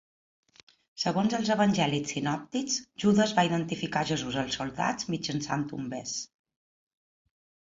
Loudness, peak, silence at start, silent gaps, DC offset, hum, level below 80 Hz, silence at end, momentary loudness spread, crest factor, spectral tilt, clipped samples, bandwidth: -29 LUFS; -12 dBFS; 0.95 s; none; under 0.1%; none; -62 dBFS; 1.5 s; 10 LU; 20 dB; -4.5 dB/octave; under 0.1%; 7.8 kHz